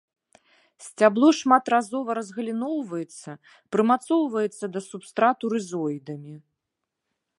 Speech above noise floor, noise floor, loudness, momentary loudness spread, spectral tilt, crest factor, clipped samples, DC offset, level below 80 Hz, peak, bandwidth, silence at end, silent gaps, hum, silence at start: 59 dB; -83 dBFS; -24 LUFS; 19 LU; -5 dB/octave; 22 dB; under 0.1%; under 0.1%; -80 dBFS; -4 dBFS; 11.5 kHz; 1 s; none; none; 0.8 s